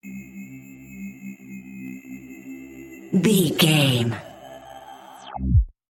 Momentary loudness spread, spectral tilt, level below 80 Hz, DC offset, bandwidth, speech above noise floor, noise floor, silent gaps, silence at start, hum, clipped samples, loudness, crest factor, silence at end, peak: 24 LU; -5 dB/octave; -34 dBFS; under 0.1%; 17 kHz; 24 dB; -42 dBFS; none; 0.05 s; none; under 0.1%; -20 LUFS; 20 dB; 0.2 s; -4 dBFS